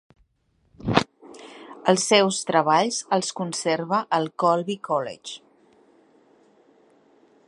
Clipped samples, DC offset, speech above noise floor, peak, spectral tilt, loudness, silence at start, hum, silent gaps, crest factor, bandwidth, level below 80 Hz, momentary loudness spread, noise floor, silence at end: under 0.1%; under 0.1%; 45 dB; 0 dBFS; -3.5 dB/octave; -23 LUFS; 0.85 s; none; none; 26 dB; 11.5 kHz; -58 dBFS; 20 LU; -67 dBFS; 2.1 s